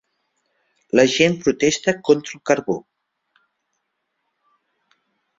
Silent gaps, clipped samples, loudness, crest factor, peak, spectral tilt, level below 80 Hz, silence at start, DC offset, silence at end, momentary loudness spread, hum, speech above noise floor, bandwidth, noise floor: none; under 0.1%; -19 LUFS; 22 dB; 0 dBFS; -4 dB/octave; -58 dBFS; 0.95 s; under 0.1%; 2.6 s; 6 LU; none; 57 dB; 7.8 kHz; -75 dBFS